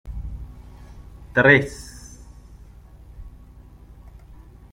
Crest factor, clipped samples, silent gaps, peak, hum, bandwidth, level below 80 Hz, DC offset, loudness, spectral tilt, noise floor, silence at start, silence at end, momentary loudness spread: 24 dB; under 0.1%; none; -2 dBFS; none; 16 kHz; -40 dBFS; under 0.1%; -17 LUFS; -6 dB/octave; -45 dBFS; 0.05 s; 1.45 s; 30 LU